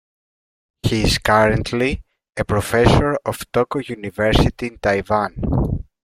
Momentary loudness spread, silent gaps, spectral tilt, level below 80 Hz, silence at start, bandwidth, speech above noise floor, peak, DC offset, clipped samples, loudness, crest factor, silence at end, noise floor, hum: 11 LU; none; -5.5 dB/octave; -30 dBFS; 0.85 s; 16 kHz; over 72 dB; 0 dBFS; under 0.1%; under 0.1%; -19 LUFS; 18 dB; 0.2 s; under -90 dBFS; none